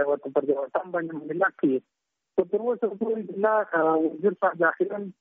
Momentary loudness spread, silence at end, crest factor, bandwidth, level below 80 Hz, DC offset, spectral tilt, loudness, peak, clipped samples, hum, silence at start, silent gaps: 7 LU; 0.1 s; 16 dB; 3.8 kHz; -76 dBFS; under 0.1%; -6 dB/octave; -26 LUFS; -10 dBFS; under 0.1%; none; 0 s; none